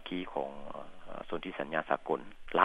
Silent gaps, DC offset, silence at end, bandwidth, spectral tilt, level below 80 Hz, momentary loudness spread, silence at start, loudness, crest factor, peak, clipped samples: none; under 0.1%; 0 s; 10.5 kHz; -6.5 dB/octave; -56 dBFS; 14 LU; 0 s; -37 LUFS; 26 dB; -8 dBFS; under 0.1%